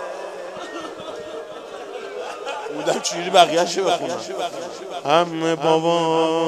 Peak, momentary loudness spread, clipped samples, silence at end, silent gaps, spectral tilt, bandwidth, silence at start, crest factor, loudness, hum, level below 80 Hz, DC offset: 0 dBFS; 16 LU; under 0.1%; 0 s; none; -3.5 dB/octave; 14 kHz; 0 s; 22 dB; -21 LUFS; none; -72 dBFS; under 0.1%